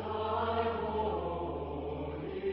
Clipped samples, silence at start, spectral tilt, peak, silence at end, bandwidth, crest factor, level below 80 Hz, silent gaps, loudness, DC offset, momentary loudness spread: under 0.1%; 0 s; -5 dB/octave; -18 dBFS; 0 s; 5.6 kHz; 18 dB; -48 dBFS; none; -35 LUFS; under 0.1%; 6 LU